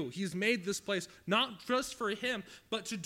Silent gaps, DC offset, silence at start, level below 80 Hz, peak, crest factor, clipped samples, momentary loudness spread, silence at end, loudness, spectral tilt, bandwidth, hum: none; under 0.1%; 0 s; -70 dBFS; -18 dBFS; 18 dB; under 0.1%; 7 LU; 0 s; -34 LUFS; -3.5 dB/octave; 16.5 kHz; none